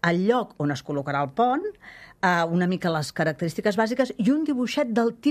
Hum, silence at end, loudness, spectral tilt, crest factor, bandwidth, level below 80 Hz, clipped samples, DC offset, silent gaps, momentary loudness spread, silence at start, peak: none; 0 s; -24 LUFS; -6 dB/octave; 18 dB; 14.5 kHz; -62 dBFS; under 0.1%; under 0.1%; none; 6 LU; 0.05 s; -6 dBFS